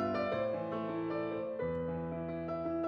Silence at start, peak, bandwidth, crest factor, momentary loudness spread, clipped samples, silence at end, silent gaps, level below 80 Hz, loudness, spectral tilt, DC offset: 0 s; -22 dBFS; 5.8 kHz; 14 dB; 5 LU; under 0.1%; 0 s; none; -64 dBFS; -37 LUFS; -9 dB/octave; under 0.1%